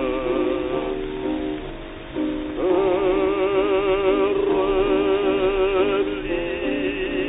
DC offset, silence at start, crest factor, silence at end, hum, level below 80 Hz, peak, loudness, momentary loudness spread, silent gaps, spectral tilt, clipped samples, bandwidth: under 0.1%; 0 s; 12 dB; 0 s; none; -40 dBFS; -8 dBFS; -22 LUFS; 8 LU; none; -10.5 dB/octave; under 0.1%; 4 kHz